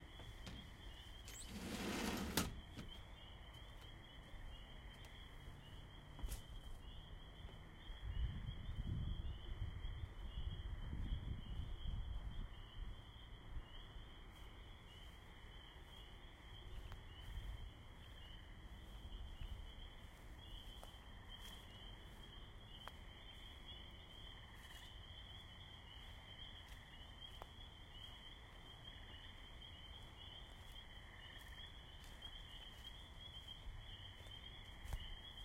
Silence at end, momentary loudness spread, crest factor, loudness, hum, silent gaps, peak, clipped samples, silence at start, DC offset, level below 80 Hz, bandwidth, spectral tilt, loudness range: 0 s; 10 LU; 28 dB; -54 LUFS; none; none; -24 dBFS; under 0.1%; 0 s; under 0.1%; -54 dBFS; 16 kHz; -4 dB/octave; 9 LU